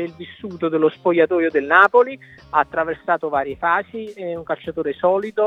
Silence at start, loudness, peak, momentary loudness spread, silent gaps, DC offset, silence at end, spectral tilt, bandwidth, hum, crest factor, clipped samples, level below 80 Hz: 0 s; -19 LUFS; 0 dBFS; 16 LU; none; under 0.1%; 0 s; -7 dB/octave; 6.6 kHz; none; 20 dB; under 0.1%; -58 dBFS